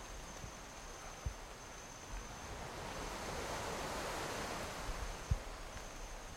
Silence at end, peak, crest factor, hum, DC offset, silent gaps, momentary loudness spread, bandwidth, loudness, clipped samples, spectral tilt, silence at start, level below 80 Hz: 0 s; -24 dBFS; 22 dB; none; under 0.1%; none; 9 LU; 16.5 kHz; -45 LUFS; under 0.1%; -3.5 dB/octave; 0 s; -50 dBFS